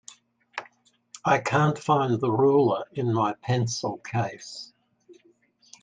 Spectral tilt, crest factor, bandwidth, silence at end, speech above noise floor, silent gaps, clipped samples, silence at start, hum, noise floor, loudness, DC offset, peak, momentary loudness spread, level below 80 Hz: -6 dB/octave; 18 dB; 9.4 kHz; 0.7 s; 38 dB; none; under 0.1%; 0.55 s; none; -62 dBFS; -25 LUFS; under 0.1%; -8 dBFS; 18 LU; -66 dBFS